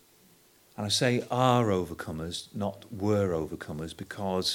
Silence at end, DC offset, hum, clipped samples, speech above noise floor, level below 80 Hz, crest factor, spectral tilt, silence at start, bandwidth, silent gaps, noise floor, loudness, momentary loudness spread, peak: 0 s; under 0.1%; none; under 0.1%; 32 dB; -58 dBFS; 20 dB; -5 dB/octave; 0.8 s; 19 kHz; none; -61 dBFS; -29 LUFS; 13 LU; -10 dBFS